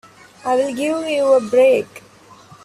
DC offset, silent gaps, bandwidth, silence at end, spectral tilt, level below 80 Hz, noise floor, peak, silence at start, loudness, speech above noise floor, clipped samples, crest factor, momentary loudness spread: under 0.1%; none; 13.5 kHz; 0.65 s; -4 dB/octave; -64 dBFS; -45 dBFS; -4 dBFS; 0.45 s; -17 LUFS; 29 dB; under 0.1%; 14 dB; 10 LU